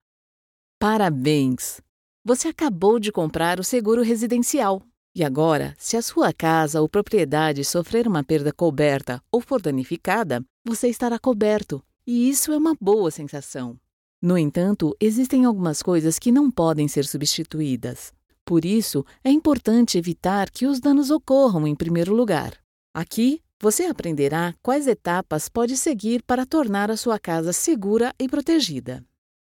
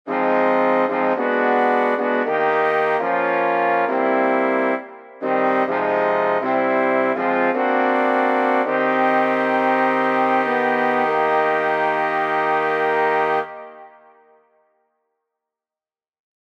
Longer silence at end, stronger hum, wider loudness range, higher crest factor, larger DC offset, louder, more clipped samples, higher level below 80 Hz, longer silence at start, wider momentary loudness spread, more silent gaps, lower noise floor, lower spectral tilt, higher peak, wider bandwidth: second, 0.5 s vs 2.55 s; neither; about the same, 3 LU vs 4 LU; about the same, 16 dB vs 14 dB; neither; about the same, -21 LUFS vs -19 LUFS; neither; first, -54 dBFS vs -76 dBFS; first, 0.8 s vs 0.05 s; first, 8 LU vs 2 LU; first, 1.89-2.25 s, 4.97-5.15 s, 10.50-10.65 s, 13.93-14.22 s, 18.41-18.47 s, 22.64-22.94 s, 23.53-23.60 s vs none; about the same, under -90 dBFS vs under -90 dBFS; second, -5 dB/octave vs -6.5 dB/octave; about the same, -6 dBFS vs -6 dBFS; first, 17 kHz vs 8.6 kHz